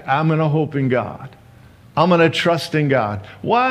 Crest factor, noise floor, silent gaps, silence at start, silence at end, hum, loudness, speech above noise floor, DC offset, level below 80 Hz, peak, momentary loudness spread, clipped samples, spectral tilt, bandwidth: 16 dB; -45 dBFS; none; 0 s; 0 s; none; -18 LUFS; 28 dB; under 0.1%; -58 dBFS; -2 dBFS; 12 LU; under 0.1%; -6.5 dB/octave; 13.5 kHz